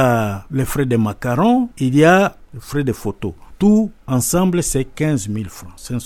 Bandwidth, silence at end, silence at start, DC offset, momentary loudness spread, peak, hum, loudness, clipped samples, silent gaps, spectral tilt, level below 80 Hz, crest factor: 17.5 kHz; 0 s; 0 s; under 0.1%; 14 LU; 0 dBFS; none; -17 LUFS; under 0.1%; none; -6 dB/octave; -38 dBFS; 16 dB